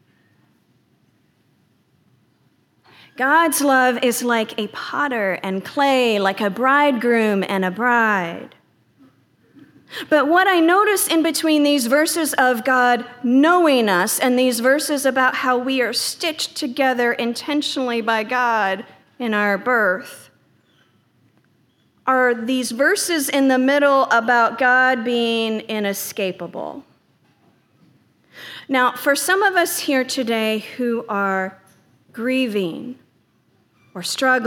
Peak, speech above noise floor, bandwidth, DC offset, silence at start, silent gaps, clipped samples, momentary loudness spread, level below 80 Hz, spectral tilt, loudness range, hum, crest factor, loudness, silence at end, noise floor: -4 dBFS; 43 dB; 19 kHz; under 0.1%; 3.2 s; none; under 0.1%; 11 LU; -80 dBFS; -3 dB/octave; 7 LU; none; 16 dB; -18 LUFS; 0 s; -61 dBFS